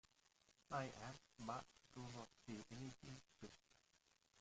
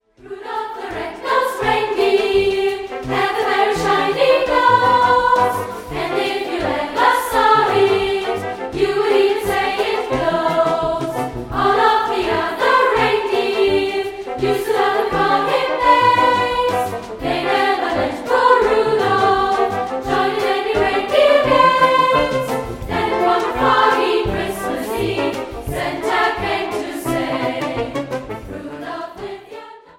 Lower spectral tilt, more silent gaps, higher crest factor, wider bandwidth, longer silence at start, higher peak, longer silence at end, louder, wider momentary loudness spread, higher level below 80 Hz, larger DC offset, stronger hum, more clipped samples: about the same, -5 dB/octave vs -4.5 dB/octave; neither; first, 22 dB vs 16 dB; second, 9 kHz vs 16.5 kHz; about the same, 0.25 s vs 0.25 s; second, -34 dBFS vs 0 dBFS; second, 0 s vs 0.2 s; second, -55 LUFS vs -17 LUFS; about the same, 13 LU vs 12 LU; second, -78 dBFS vs -42 dBFS; neither; neither; neither